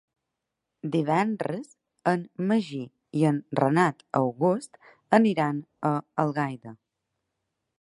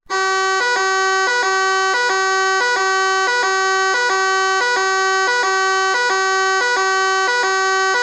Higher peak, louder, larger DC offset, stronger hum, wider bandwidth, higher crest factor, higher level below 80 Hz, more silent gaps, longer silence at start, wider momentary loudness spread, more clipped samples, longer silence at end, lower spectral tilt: about the same, -4 dBFS vs -6 dBFS; second, -26 LUFS vs -16 LUFS; neither; neither; about the same, 11.5 kHz vs 11.5 kHz; first, 22 dB vs 12 dB; second, -74 dBFS vs -60 dBFS; neither; first, 0.85 s vs 0.1 s; first, 12 LU vs 0 LU; neither; first, 1.05 s vs 0 s; first, -7.5 dB/octave vs 0.5 dB/octave